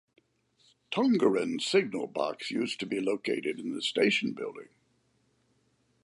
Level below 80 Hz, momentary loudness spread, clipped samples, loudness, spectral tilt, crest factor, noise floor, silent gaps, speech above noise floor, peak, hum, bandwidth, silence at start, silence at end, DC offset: -80 dBFS; 9 LU; under 0.1%; -30 LUFS; -4.5 dB/octave; 20 dB; -71 dBFS; none; 42 dB; -12 dBFS; none; 11.5 kHz; 0.9 s; 1.4 s; under 0.1%